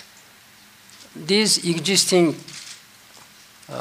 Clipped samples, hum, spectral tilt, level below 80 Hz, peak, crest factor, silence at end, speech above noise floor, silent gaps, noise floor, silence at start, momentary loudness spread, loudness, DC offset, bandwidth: under 0.1%; none; -3 dB/octave; -72 dBFS; -2 dBFS; 20 dB; 0 s; 30 dB; none; -50 dBFS; 1 s; 22 LU; -18 LUFS; under 0.1%; 16 kHz